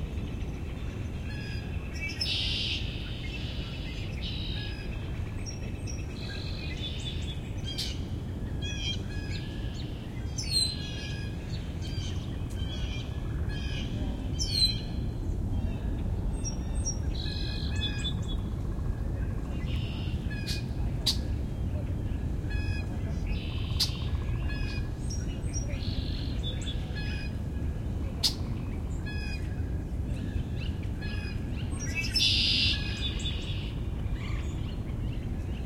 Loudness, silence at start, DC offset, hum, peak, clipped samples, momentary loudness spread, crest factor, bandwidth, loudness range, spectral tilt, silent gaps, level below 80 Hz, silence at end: -32 LUFS; 0 s; under 0.1%; none; -10 dBFS; under 0.1%; 8 LU; 20 dB; 16 kHz; 7 LU; -4.5 dB/octave; none; -36 dBFS; 0 s